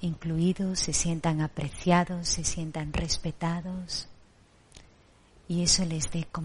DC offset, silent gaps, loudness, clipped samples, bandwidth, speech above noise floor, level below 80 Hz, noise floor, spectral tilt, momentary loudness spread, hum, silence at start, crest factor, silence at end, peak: under 0.1%; none; -28 LUFS; under 0.1%; 11.5 kHz; 30 dB; -44 dBFS; -59 dBFS; -4 dB/octave; 10 LU; none; 0 s; 20 dB; 0 s; -10 dBFS